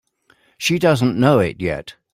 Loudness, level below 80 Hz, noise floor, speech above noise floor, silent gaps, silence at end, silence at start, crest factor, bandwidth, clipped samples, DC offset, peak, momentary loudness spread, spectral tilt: -17 LUFS; -48 dBFS; -58 dBFS; 41 dB; none; 0.2 s; 0.6 s; 16 dB; 16 kHz; under 0.1%; under 0.1%; -2 dBFS; 10 LU; -6 dB/octave